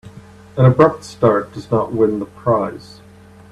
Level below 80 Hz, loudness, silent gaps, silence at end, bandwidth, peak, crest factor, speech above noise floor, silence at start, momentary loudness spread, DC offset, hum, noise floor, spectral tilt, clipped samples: -48 dBFS; -16 LUFS; none; 0.75 s; 11 kHz; 0 dBFS; 18 dB; 27 dB; 0.05 s; 12 LU; under 0.1%; none; -43 dBFS; -8.5 dB/octave; under 0.1%